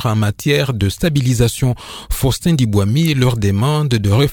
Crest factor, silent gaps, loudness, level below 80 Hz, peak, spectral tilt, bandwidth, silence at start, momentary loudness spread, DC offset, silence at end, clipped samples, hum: 14 dB; none; -16 LUFS; -32 dBFS; 0 dBFS; -6 dB/octave; 19.5 kHz; 0 s; 5 LU; under 0.1%; 0 s; under 0.1%; none